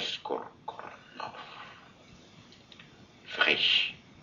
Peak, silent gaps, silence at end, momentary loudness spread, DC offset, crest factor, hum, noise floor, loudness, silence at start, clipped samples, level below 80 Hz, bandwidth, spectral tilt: -8 dBFS; none; 0 s; 23 LU; under 0.1%; 26 dB; none; -55 dBFS; -27 LUFS; 0 s; under 0.1%; -72 dBFS; 7.4 kHz; 1.5 dB/octave